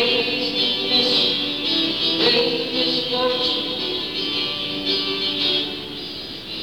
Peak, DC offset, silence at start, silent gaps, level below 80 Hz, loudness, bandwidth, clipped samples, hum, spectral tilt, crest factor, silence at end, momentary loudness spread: -4 dBFS; 0.3%; 0 s; none; -54 dBFS; -19 LUFS; 18.5 kHz; under 0.1%; none; -3.5 dB/octave; 16 dB; 0 s; 9 LU